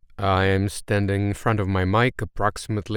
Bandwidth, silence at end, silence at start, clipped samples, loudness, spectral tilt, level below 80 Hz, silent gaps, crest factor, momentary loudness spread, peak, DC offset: 16 kHz; 0 s; 0.2 s; under 0.1%; -23 LUFS; -6 dB/octave; -42 dBFS; none; 16 dB; 5 LU; -6 dBFS; under 0.1%